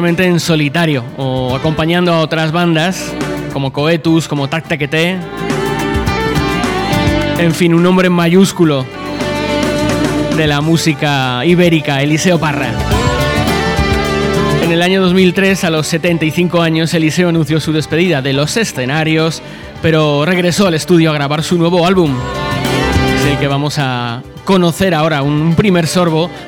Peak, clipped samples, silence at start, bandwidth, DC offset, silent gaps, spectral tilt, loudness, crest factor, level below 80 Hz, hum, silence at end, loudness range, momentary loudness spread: 0 dBFS; under 0.1%; 0 s; 17.5 kHz; under 0.1%; none; -5.5 dB/octave; -13 LUFS; 12 dB; -32 dBFS; none; 0 s; 2 LU; 6 LU